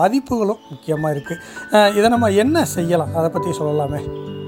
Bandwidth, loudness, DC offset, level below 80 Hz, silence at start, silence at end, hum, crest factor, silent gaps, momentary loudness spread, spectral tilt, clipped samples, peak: 17 kHz; -18 LUFS; under 0.1%; -48 dBFS; 0 s; 0 s; none; 16 dB; none; 12 LU; -5.5 dB/octave; under 0.1%; -2 dBFS